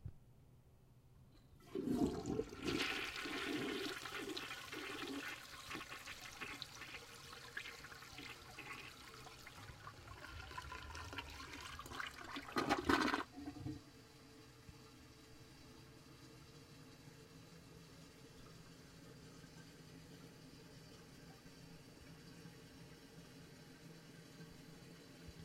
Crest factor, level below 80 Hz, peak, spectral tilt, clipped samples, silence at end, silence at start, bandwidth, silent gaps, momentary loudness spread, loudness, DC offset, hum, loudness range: 30 dB; -66 dBFS; -18 dBFS; -4 dB/octave; under 0.1%; 0 s; 0 s; 16 kHz; none; 20 LU; -45 LUFS; under 0.1%; none; 17 LU